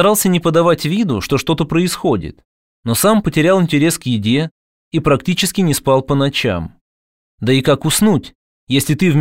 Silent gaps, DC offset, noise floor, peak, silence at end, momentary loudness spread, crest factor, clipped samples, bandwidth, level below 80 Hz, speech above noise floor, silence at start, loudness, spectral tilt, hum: 2.45-2.83 s, 4.51-4.91 s, 6.81-7.38 s, 8.35-8.67 s; 0.5%; under -90 dBFS; 0 dBFS; 0 s; 7 LU; 14 dB; under 0.1%; 16.5 kHz; -42 dBFS; over 76 dB; 0 s; -15 LUFS; -5 dB/octave; none